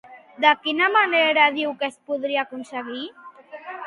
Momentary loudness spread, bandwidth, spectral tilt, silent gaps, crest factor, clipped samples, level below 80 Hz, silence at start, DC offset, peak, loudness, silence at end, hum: 19 LU; 11.5 kHz; -3 dB/octave; none; 20 dB; under 0.1%; -76 dBFS; 0.05 s; under 0.1%; -2 dBFS; -20 LUFS; 0 s; none